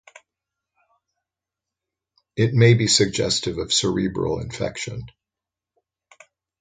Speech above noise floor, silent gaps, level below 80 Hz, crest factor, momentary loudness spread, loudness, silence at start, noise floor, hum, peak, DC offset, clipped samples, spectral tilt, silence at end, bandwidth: 68 dB; none; -50 dBFS; 22 dB; 15 LU; -20 LUFS; 2.35 s; -88 dBFS; none; -2 dBFS; under 0.1%; under 0.1%; -4.5 dB/octave; 1.5 s; 9.6 kHz